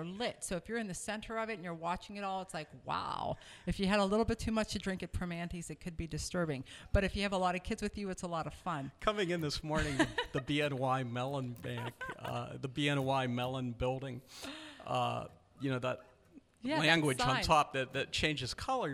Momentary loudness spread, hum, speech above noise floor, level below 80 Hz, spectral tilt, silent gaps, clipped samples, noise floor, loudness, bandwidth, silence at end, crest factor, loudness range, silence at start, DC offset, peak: 12 LU; none; 26 dB; -50 dBFS; -5 dB/octave; none; under 0.1%; -62 dBFS; -36 LUFS; 15.5 kHz; 0 s; 22 dB; 5 LU; 0 s; under 0.1%; -14 dBFS